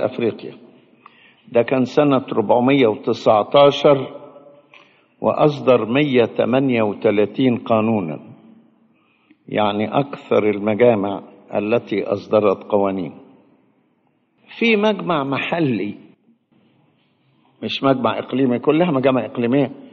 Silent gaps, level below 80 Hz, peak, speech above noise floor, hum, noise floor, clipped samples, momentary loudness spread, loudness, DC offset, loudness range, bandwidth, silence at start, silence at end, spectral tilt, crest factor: none; -64 dBFS; -2 dBFS; 46 dB; none; -63 dBFS; under 0.1%; 10 LU; -18 LUFS; under 0.1%; 5 LU; 6.8 kHz; 0 s; 0.1 s; -5 dB/octave; 18 dB